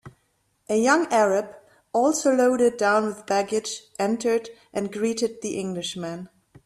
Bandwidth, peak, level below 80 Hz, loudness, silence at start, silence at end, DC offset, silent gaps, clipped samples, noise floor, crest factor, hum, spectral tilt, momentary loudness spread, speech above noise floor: 13.5 kHz; -6 dBFS; -66 dBFS; -23 LUFS; 0.05 s; 0.4 s; under 0.1%; none; under 0.1%; -69 dBFS; 18 dB; none; -4 dB/octave; 12 LU; 46 dB